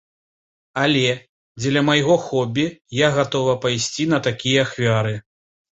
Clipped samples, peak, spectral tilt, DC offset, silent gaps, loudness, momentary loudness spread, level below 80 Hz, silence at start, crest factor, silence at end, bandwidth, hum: under 0.1%; -4 dBFS; -4.5 dB/octave; under 0.1%; 1.29-1.55 s, 2.81-2.85 s; -19 LUFS; 8 LU; -56 dBFS; 0.75 s; 18 dB; 0.6 s; 8.2 kHz; none